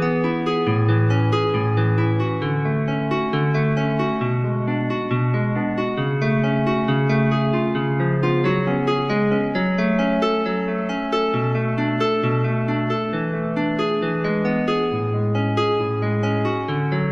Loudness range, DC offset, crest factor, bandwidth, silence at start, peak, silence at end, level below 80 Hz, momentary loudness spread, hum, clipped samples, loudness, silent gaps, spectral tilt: 2 LU; under 0.1%; 12 dB; 7.2 kHz; 0 s; -8 dBFS; 0 s; -50 dBFS; 4 LU; none; under 0.1%; -21 LUFS; none; -8 dB/octave